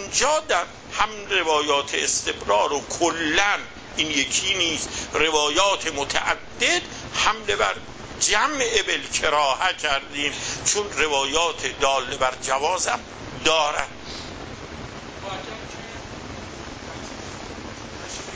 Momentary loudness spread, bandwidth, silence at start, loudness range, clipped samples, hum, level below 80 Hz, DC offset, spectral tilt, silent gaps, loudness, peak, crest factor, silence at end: 16 LU; 8 kHz; 0 s; 13 LU; under 0.1%; none; -46 dBFS; under 0.1%; -1.5 dB/octave; none; -22 LUFS; -4 dBFS; 20 dB; 0 s